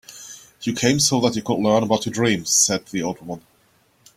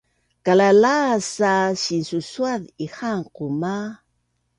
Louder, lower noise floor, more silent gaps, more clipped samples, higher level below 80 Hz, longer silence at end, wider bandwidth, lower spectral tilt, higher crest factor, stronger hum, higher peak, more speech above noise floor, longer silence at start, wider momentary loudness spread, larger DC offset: about the same, -19 LUFS vs -20 LUFS; second, -60 dBFS vs -70 dBFS; neither; neither; first, -56 dBFS vs -64 dBFS; first, 0.8 s vs 0.65 s; first, 16 kHz vs 11 kHz; second, -3.5 dB/octave vs -5 dB/octave; about the same, 20 dB vs 16 dB; neither; about the same, -2 dBFS vs -4 dBFS; second, 40 dB vs 50 dB; second, 0.1 s vs 0.45 s; first, 20 LU vs 14 LU; neither